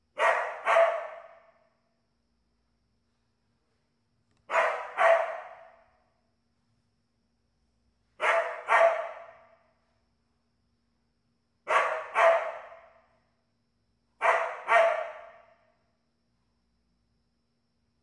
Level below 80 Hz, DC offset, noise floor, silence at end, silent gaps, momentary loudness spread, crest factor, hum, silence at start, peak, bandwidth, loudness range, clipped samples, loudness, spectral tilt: -80 dBFS; under 0.1%; -76 dBFS; 2.75 s; none; 18 LU; 22 dB; none; 0.15 s; -10 dBFS; 11 kHz; 6 LU; under 0.1%; -26 LUFS; -0.5 dB/octave